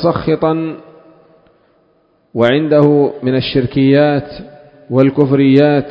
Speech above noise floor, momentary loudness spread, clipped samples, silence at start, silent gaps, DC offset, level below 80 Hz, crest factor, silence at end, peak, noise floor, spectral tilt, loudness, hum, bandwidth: 44 dB; 14 LU; under 0.1%; 0 s; none; under 0.1%; -46 dBFS; 14 dB; 0 s; 0 dBFS; -55 dBFS; -9.5 dB/octave; -12 LUFS; none; 5.4 kHz